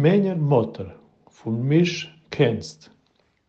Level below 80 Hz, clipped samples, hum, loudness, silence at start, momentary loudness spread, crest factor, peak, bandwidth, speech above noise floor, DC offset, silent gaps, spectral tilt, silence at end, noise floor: -62 dBFS; under 0.1%; none; -22 LUFS; 0 s; 17 LU; 18 dB; -6 dBFS; 8 kHz; 44 dB; under 0.1%; none; -7 dB/octave; 0.75 s; -65 dBFS